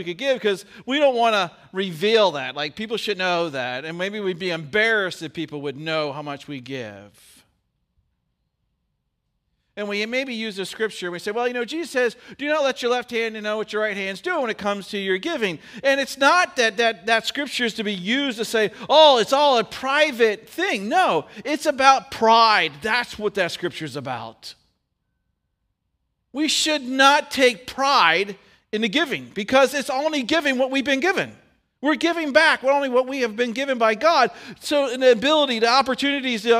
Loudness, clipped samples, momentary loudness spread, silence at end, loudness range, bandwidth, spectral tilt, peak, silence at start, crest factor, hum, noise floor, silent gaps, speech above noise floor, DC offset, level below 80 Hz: -21 LUFS; under 0.1%; 12 LU; 0 s; 11 LU; 16 kHz; -3 dB/octave; 0 dBFS; 0 s; 22 dB; none; -75 dBFS; none; 54 dB; under 0.1%; -64 dBFS